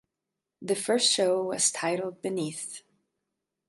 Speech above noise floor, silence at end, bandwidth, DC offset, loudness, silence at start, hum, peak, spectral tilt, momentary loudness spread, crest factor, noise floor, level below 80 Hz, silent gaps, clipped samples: 59 dB; 0.9 s; 12 kHz; under 0.1%; -27 LUFS; 0.6 s; none; -12 dBFS; -2 dB/octave; 16 LU; 18 dB; -87 dBFS; -78 dBFS; none; under 0.1%